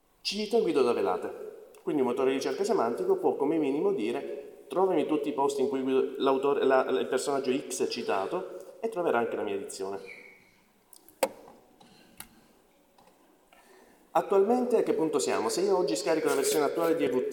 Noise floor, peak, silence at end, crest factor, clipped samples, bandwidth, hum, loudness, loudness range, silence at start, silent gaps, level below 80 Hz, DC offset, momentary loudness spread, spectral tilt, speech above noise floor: -63 dBFS; -10 dBFS; 0 s; 20 dB; under 0.1%; 19 kHz; none; -28 LUFS; 13 LU; 0.25 s; none; -74 dBFS; under 0.1%; 12 LU; -4 dB/octave; 36 dB